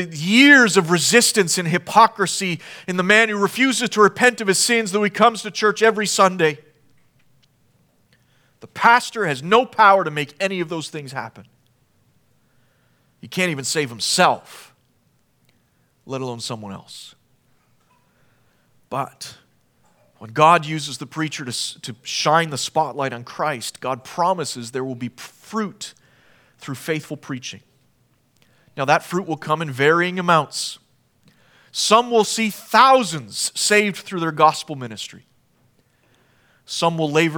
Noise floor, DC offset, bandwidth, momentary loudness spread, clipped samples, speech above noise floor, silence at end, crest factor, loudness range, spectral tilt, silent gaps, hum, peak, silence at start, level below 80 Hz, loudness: -62 dBFS; under 0.1%; 19.5 kHz; 17 LU; under 0.1%; 43 dB; 0 s; 20 dB; 15 LU; -3 dB/octave; none; none; 0 dBFS; 0 s; -72 dBFS; -18 LUFS